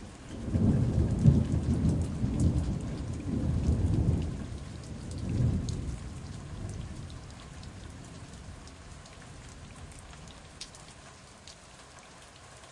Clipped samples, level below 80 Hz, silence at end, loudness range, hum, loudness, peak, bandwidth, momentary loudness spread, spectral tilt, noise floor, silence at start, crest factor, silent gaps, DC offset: under 0.1%; -40 dBFS; 0 s; 19 LU; none; -31 LUFS; -10 dBFS; 11.5 kHz; 21 LU; -7.5 dB/octave; -51 dBFS; 0 s; 22 dB; none; under 0.1%